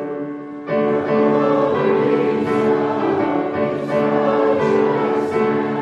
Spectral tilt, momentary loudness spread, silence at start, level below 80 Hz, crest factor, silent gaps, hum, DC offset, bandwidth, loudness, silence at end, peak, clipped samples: -8 dB/octave; 5 LU; 0 s; -64 dBFS; 14 dB; none; none; under 0.1%; 8.2 kHz; -18 LUFS; 0 s; -4 dBFS; under 0.1%